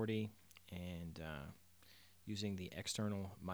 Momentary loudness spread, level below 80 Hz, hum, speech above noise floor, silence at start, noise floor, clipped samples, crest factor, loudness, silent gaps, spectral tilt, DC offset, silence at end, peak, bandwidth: 21 LU; -68 dBFS; none; 23 dB; 0 s; -67 dBFS; under 0.1%; 16 dB; -46 LUFS; none; -5 dB/octave; under 0.1%; 0 s; -30 dBFS; over 20 kHz